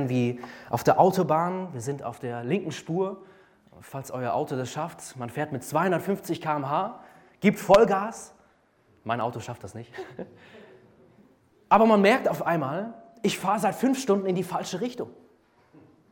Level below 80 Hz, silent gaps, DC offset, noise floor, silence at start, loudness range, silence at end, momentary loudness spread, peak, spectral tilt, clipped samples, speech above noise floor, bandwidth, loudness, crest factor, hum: -62 dBFS; none; under 0.1%; -63 dBFS; 0 s; 8 LU; 1 s; 20 LU; -6 dBFS; -6 dB/octave; under 0.1%; 37 dB; 17.5 kHz; -26 LUFS; 20 dB; none